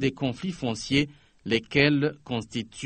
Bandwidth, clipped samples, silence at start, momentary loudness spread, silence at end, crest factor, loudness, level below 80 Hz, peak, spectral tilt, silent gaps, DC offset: 8.8 kHz; under 0.1%; 0 s; 12 LU; 0 s; 22 dB; -26 LUFS; -54 dBFS; -6 dBFS; -5.5 dB/octave; none; under 0.1%